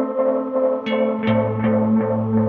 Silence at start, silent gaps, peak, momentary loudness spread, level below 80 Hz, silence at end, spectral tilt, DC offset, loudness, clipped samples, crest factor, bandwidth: 0 s; none; -6 dBFS; 2 LU; -54 dBFS; 0 s; -10 dB/octave; under 0.1%; -20 LUFS; under 0.1%; 12 dB; 4.3 kHz